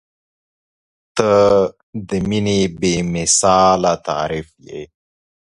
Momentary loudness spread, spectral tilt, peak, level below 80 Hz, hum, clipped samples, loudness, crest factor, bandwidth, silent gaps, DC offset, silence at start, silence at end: 19 LU; -4 dB/octave; 0 dBFS; -44 dBFS; none; under 0.1%; -16 LUFS; 18 dB; 11.5 kHz; 1.83-1.93 s; under 0.1%; 1.15 s; 0.55 s